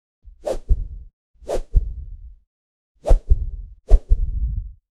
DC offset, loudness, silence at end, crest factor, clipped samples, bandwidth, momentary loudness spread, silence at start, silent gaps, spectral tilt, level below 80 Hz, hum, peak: under 0.1%; -25 LUFS; 0.25 s; 20 dB; under 0.1%; 8 kHz; 19 LU; 0.45 s; 1.13-1.34 s, 2.47-2.95 s; -7.5 dB/octave; -20 dBFS; none; 0 dBFS